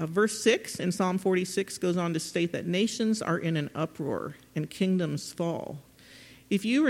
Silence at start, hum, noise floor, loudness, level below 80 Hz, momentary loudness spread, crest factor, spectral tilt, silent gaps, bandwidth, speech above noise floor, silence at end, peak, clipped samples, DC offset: 0 s; none; -52 dBFS; -29 LUFS; -68 dBFS; 10 LU; 20 dB; -5 dB/octave; none; 16.5 kHz; 24 dB; 0 s; -10 dBFS; under 0.1%; under 0.1%